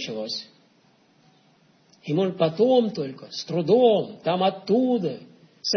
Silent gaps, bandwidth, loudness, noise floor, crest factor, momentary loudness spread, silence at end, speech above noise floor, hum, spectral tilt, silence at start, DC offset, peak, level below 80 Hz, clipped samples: none; 6.6 kHz; -23 LUFS; -60 dBFS; 18 dB; 14 LU; 0 s; 38 dB; none; -6 dB/octave; 0 s; under 0.1%; -8 dBFS; -74 dBFS; under 0.1%